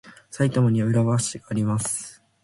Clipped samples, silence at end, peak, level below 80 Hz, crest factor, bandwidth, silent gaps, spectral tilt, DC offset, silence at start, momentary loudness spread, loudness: under 0.1%; 0.3 s; -8 dBFS; -56 dBFS; 16 dB; 11.5 kHz; none; -6 dB/octave; under 0.1%; 0.05 s; 10 LU; -23 LUFS